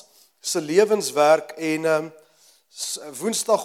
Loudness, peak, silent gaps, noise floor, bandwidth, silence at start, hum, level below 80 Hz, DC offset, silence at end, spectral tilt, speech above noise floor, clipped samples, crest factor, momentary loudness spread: -22 LUFS; -2 dBFS; none; -57 dBFS; 16.5 kHz; 0.45 s; none; -86 dBFS; under 0.1%; 0 s; -3 dB/octave; 36 dB; under 0.1%; 20 dB; 12 LU